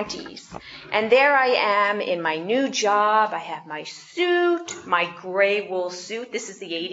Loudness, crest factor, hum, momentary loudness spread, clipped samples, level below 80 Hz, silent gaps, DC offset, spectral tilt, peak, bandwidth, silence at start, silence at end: -22 LUFS; 18 dB; none; 16 LU; under 0.1%; -66 dBFS; none; under 0.1%; -3 dB/octave; -4 dBFS; 8 kHz; 0 s; 0 s